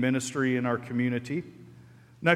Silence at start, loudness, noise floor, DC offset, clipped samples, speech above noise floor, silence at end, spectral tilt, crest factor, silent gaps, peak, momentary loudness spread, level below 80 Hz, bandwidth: 0 s; -29 LUFS; -53 dBFS; under 0.1%; under 0.1%; 24 dB; 0 s; -5.5 dB/octave; 20 dB; none; -8 dBFS; 8 LU; -68 dBFS; 13.5 kHz